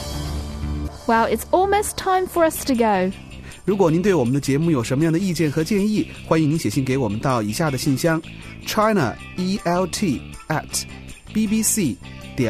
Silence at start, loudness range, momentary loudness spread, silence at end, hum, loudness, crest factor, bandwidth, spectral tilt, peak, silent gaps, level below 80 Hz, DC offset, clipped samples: 0 s; 3 LU; 10 LU; 0 s; none; -21 LUFS; 16 dB; 14 kHz; -5 dB/octave; -4 dBFS; none; -38 dBFS; under 0.1%; under 0.1%